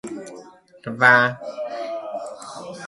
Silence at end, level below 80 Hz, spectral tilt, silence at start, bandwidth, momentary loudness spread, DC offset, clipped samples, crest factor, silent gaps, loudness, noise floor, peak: 0 s; -68 dBFS; -4.5 dB/octave; 0.05 s; 11.5 kHz; 22 LU; under 0.1%; under 0.1%; 22 dB; none; -19 LUFS; -45 dBFS; 0 dBFS